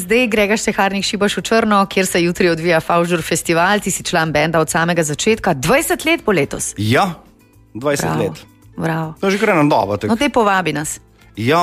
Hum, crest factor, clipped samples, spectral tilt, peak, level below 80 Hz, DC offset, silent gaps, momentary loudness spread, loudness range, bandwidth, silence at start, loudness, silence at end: none; 14 dB; under 0.1%; -4.5 dB/octave; -2 dBFS; -44 dBFS; under 0.1%; none; 7 LU; 3 LU; 15.5 kHz; 0 s; -16 LUFS; 0 s